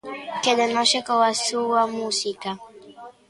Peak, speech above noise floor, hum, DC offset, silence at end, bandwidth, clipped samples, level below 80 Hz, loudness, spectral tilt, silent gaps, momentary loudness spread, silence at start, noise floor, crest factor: -6 dBFS; 22 dB; none; under 0.1%; 0.2 s; 11.5 kHz; under 0.1%; -70 dBFS; -22 LUFS; -1.5 dB/octave; none; 13 LU; 0.05 s; -44 dBFS; 18 dB